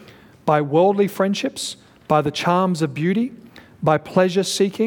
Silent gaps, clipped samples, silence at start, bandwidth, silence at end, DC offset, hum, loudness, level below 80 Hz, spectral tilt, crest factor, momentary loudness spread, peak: none; under 0.1%; 0.45 s; 19 kHz; 0 s; under 0.1%; none; -20 LUFS; -60 dBFS; -5.5 dB/octave; 16 dB; 10 LU; -4 dBFS